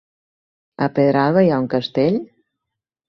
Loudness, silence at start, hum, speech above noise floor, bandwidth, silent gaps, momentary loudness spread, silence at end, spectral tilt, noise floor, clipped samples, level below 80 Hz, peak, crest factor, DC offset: -18 LUFS; 0.8 s; none; 66 dB; 6.2 kHz; none; 8 LU; 0.85 s; -9 dB/octave; -83 dBFS; under 0.1%; -58 dBFS; -4 dBFS; 16 dB; under 0.1%